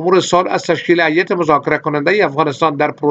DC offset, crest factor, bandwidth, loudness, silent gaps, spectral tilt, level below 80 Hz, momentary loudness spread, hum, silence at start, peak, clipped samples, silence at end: under 0.1%; 14 dB; 8.2 kHz; -14 LUFS; none; -5 dB/octave; -56 dBFS; 4 LU; none; 0 s; 0 dBFS; under 0.1%; 0 s